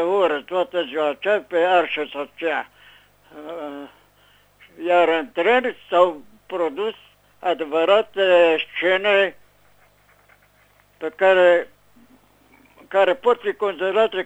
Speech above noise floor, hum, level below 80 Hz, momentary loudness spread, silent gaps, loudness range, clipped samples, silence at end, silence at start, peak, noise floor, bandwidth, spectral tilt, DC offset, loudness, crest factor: 38 dB; 50 Hz at -65 dBFS; -66 dBFS; 16 LU; none; 5 LU; under 0.1%; 0 s; 0 s; -2 dBFS; -57 dBFS; 9 kHz; -4.5 dB/octave; under 0.1%; -20 LUFS; 18 dB